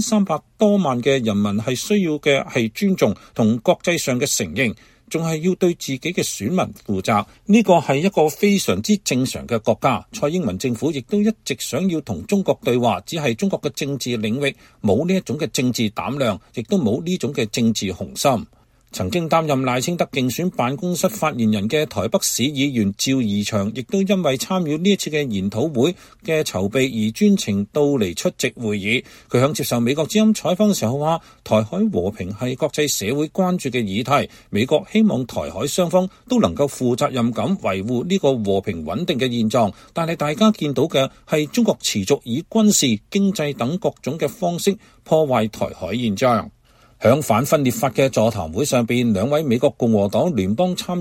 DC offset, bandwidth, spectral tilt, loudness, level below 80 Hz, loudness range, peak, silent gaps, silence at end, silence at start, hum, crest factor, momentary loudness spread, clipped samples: under 0.1%; 16.5 kHz; -5 dB/octave; -20 LUFS; -52 dBFS; 3 LU; -2 dBFS; none; 0 s; 0 s; none; 18 dB; 6 LU; under 0.1%